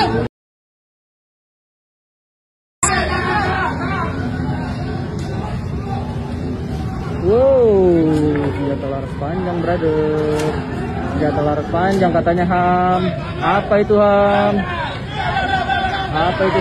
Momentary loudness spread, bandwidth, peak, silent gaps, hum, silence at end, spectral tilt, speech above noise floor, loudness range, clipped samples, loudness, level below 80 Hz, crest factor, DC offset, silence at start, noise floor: 11 LU; 13 kHz; -2 dBFS; 0.29-2.82 s; none; 0 s; -6 dB/octave; over 75 dB; 7 LU; under 0.1%; -17 LUFS; -34 dBFS; 16 dB; under 0.1%; 0 s; under -90 dBFS